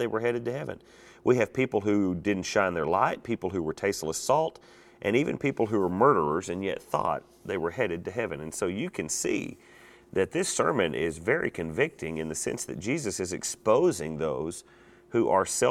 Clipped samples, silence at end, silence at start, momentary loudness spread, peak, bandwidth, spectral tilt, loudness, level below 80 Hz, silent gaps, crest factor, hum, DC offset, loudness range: under 0.1%; 0 s; 0 s; 9 LU; -8 dBFS; 16 kHz; -4.5 dB/octave; -28 LUFS; -58 dBFS; none; 20 dB; none; under 0.1%; 4 LU